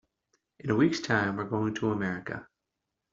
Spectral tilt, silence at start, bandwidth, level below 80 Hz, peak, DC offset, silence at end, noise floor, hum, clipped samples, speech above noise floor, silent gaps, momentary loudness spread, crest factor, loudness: -6 dB/octave; 0.65 s; 7.6 kHz; -64 dBFS; -10 dBFS; under 0.1%; 0.7 s; -85 dBFS; none; under 0.1%; 57 dB; none; 14 LU; 20 dB; -29 LUFS